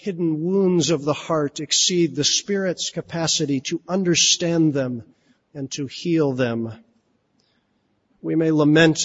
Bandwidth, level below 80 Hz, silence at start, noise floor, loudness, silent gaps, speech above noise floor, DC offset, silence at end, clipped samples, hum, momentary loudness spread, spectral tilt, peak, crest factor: 8 kHz; -60 dBFS; 0 s; -67 dBFS; -20 LUFS; none; 47 dB; under 0.1%; 0 s; under 0.1%; none; 13 LU; -3.5 dB/octave; -2 dBFS; 20 dB